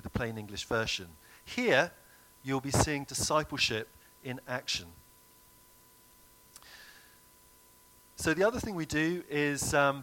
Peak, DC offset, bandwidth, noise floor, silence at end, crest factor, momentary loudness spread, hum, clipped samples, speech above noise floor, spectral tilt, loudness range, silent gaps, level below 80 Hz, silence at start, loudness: -10 dBFS; under 0.1%; 17.5 kHz; -60 dBFS; 0 s; 24 dB; 23 LU; none; under 0.1%; 29 dB; -3.5 dB/octave; 10 LU; none; -54 dBFS; 0.05 s; -31 LUFS